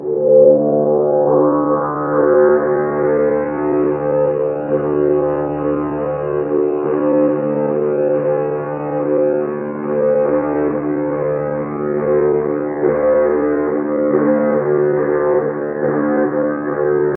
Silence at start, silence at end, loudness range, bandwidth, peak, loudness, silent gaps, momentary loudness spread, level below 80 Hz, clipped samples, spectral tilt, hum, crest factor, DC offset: 0 s; 0 s; 3 LU; 3 kHz; 0 dBFS; -16 LUFS; none; 6 LU; -48 dBFS; under 0.1%; -13.5 dB/octave; none; 16 dB; under 0.1%